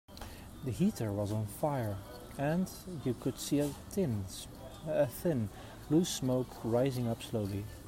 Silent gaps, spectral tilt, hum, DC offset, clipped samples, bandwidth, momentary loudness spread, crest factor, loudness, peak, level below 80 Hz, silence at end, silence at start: none; -6 dB/octave; none; under 0.1%; under 0.1%; 16 kHz; 13 LU; 16 dB; -35 LUFS; -18 dBFS; -56 dBFS; 0 s; 0.1 s